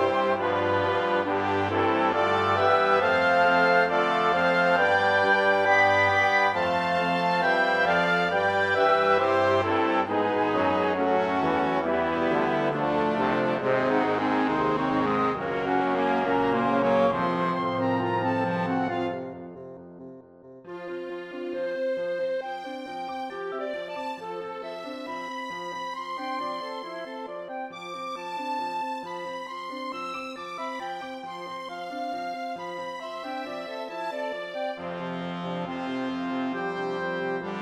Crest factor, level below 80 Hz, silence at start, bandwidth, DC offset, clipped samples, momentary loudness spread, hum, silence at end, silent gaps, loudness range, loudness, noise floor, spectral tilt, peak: 18 dB; -62 dBFS; 0 s; 12 kHz; under 0.1%; under 0.1%; 14 LU; none; 0 s; none; 13 LU; -25 LUFS; -48 dBFS; -6 dB/octave; -8 dBFS